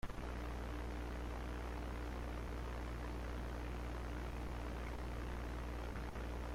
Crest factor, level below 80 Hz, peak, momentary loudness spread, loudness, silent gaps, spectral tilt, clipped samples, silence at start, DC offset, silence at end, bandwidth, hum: 12 dB; -46 dBFS; -32 dBFS; 0 LU; -46 LUFS; none; -6.5 dB/octave; under 0.1%; 0.05 s; under 0.1%; 0 s; 15 kHz; none